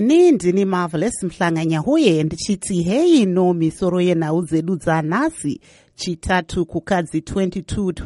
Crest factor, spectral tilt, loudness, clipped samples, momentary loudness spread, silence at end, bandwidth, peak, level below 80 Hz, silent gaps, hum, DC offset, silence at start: 16 dB; -6 dB/octave; -19 LUFS; under 0.1%; 9 LU; 0 s; 11.5 kHz; -2 dBFS; -42 dBFS; none; none; under 0.1%; 0 s